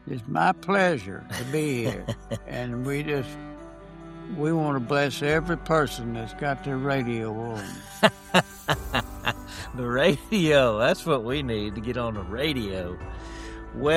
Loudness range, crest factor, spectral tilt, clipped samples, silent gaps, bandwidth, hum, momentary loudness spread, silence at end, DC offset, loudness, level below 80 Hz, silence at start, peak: 5 LU; 24 dB; -5.5 dB/octave; under 0.1%; none; 16 kHz; none; 15 LU; 0 s; under 0.1%; -26 LUFS; -44 dBFS; 0.05 s; -2 dBFS